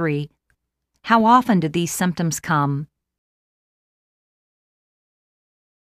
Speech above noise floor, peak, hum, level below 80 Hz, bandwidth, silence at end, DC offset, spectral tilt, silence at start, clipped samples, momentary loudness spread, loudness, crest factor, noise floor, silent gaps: 55 dB; -2 dBFS; none; -58 dBFS; 15.5 kHz; 3 s; under 0.1%; -5.5 dB/octave; 0 s; under 0.1%; 19 LU; -19 LUFS; 20 dB; -74 dBFS; none